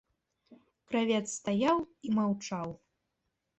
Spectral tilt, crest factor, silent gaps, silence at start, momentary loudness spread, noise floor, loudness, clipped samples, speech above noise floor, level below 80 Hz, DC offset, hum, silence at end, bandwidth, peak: -5 dB/octave; 18 dB; none; 0.5 s; 10 LU; -83 dBFS; -32 LUFS; under 0.1%; 52 dB; -68 dBFS; under 0.1%; none; 0.85 s; 8.6 kHz; -16 dBFS